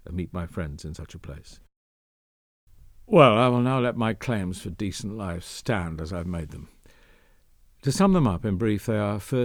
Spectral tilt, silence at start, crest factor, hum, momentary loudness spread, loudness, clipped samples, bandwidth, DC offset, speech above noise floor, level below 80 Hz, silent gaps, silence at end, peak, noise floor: -6.5 dB/octave; 0.05 s; 22 dB; none; 21 LU; -25 LUFS; under 0.1%; 18 kHz; under 0.1%; 33 dB; -46 dBFS; 1.76-2.67 s; 0 s; -2 dBFS; -57 dBFS